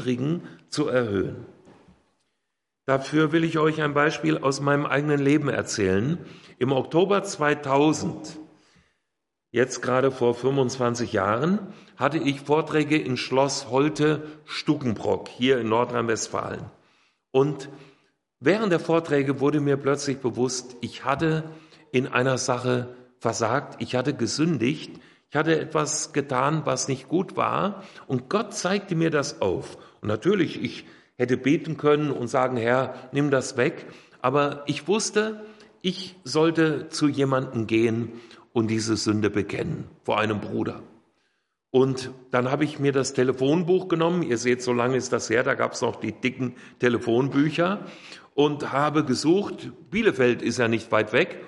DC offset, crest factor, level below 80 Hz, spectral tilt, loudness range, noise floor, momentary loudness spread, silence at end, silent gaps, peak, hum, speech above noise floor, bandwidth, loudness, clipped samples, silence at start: under 0.1%; 20 dB; -64 dBFS; -5 dB/octave; 3 LU; -83 dBFS; 9 LU; 0 s; none; -6 dBFS; none; 59 dB; 11.5 kHz; -24 LUFS; under 0.1%; 0 s